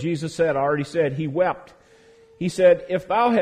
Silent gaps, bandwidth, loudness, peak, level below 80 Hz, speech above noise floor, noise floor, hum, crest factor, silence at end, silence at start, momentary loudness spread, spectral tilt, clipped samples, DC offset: none; 10.5 kHz; -22 LUFS; -4 dBFS; -58 dBFS; 31 dB; -52 dBFS; none; 16 dB; 0 s; 0 s; 10 LU; -6.5 dB/octave; under 0.1%; under 0.1%